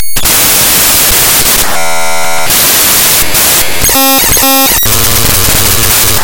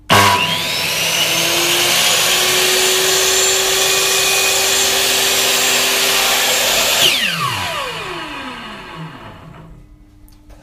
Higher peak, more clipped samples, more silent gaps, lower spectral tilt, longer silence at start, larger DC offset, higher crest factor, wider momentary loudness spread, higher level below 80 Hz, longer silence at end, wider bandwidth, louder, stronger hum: about the same, 0 dBFS vs 0 dBFS; first, 3% vs under 0.1%; neither; about the same, -1 dB/octave vs -0.5 dB/octave; about the same, 0 s vs 0.1 s; first, 10% vs under 0.1%; second, 8 dB vs 16 dB; second, 5 LU vs 14 LU; first, -22 dBFS vs -46 dBFS; about the same, 0 s vs 0.1 s; first, over 20 kHz vs 15.5 kHz; first, -5 LUFS vs -12 LUFS; neither